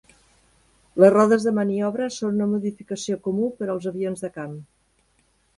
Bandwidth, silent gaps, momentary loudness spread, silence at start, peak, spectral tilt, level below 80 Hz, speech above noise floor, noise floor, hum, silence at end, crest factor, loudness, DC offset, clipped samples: 11.5 kHz; none; 16 LU; 0.95 s; -2 dBFS; -6.5 dB/octave; -64 dBFS; 43 dB; -65 dBFS; none; 0.95 s; 22 dB; -22 LUFS; under 0.1%; under 0.1%